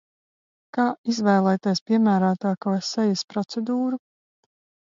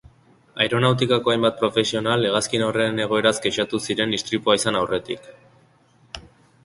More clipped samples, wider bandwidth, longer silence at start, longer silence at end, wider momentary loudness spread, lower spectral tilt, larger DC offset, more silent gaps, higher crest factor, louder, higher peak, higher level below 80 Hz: neither; second, 7.6 kHz vs 11.5 kHz; first, 0.75 s vs 0.55 s; first, 0.9 s vs 0.45 s; second, 8 LU vs 14 LU; first, -6 dB/octave vs -4 dB/octave; neither; first, 0.98-1.04 s, 1.81-1.86 s, 3.24-3.28 s vs none; about the same, 16 dB vs 20 dB; about the same, -23 LUFS vs -21 LUFS; second, -8 dBFS vs -2 dBFS; second, -72 dBFS vs -56 dBFS